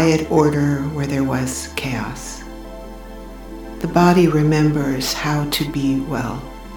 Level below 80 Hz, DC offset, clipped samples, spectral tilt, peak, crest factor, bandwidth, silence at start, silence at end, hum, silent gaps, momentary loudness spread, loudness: -36 dBFS; 0.2%; under 0.1%; -5.5 dB/octave; 0 dBFS; 18 dB; 19 kHz; 0 s; 0 s; none; none; 21 LU; -18 LUFS